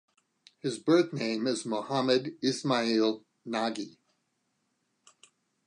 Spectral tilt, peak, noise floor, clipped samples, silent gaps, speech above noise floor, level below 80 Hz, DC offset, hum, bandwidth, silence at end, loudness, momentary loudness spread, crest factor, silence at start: -5 dB/octave; -12 dBFS; -78 dBFS; under 0.1%; none; 49 dB; -84 dBFS; under 0.1%; none; 10.5 kHz; 1.75 s; -29 LUFS; 11 LU; 20 dB; 0.65 s